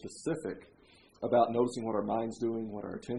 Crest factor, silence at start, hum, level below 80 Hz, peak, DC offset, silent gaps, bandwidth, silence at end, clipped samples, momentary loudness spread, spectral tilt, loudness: 20 dB; 0 s; none; -70 dBFS; -14 dBFS; under 0.1%; none; 11 kHz; 0 s; under 0.1%; 13 LU; -6.5 dB/octave; -33 LUFS